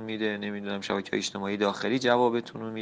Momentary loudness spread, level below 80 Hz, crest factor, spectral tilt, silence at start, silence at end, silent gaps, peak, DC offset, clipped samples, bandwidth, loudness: 9 LU; -70 dBFS; 20 dB; -4.5 dB/octave; 0 s; 0 s; none; -8 dBFS; under 0.1%; under 0.1%; 9.8 kHz; -28 LUFS